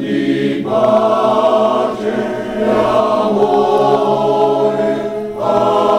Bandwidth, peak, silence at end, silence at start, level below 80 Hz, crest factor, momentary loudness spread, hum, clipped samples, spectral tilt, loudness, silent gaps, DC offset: 12.5 kHz; -2 dBFS; 0 s; 0 s; -48 dBFS; 10 dB; 6 LU; none; under 0.1%; -6.5 dB/octave; -14 LUFS; none; under 0.1%